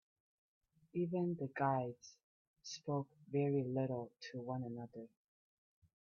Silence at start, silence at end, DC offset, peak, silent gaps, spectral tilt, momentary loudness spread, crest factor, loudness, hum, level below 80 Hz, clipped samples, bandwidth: 0.95 s; 0.95 s; under 0.1%; -24 dBFS; 2.24-2.54 s; -7 dB/octave; 18 LU; 18 dB; -41 LUFS; none; -84 dBFS; under 0.1%; 7 kHz